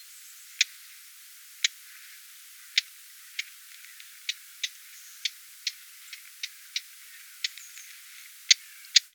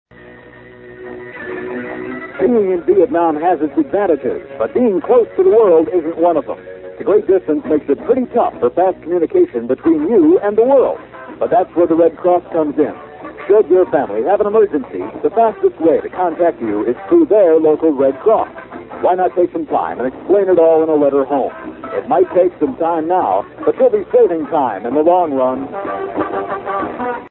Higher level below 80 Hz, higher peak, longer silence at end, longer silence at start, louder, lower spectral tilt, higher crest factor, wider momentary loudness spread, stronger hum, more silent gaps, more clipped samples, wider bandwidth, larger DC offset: second, under -90 dBFS vs -52 dBFS; about the same, 0 dBFS vs 0 dBFS; about the same, 0.05 s vs 0 s; second, 0 s vs 0.25 s; second, -29 LUFS vs -14 LUFS; second, 13 dB/octave vs -12 dB/octave; first, 34 dB vs 14 dB; first, 23 LU vs 13 LU; neither; neither; neither; first, over 20 kHz vs 4.1 kHz; neither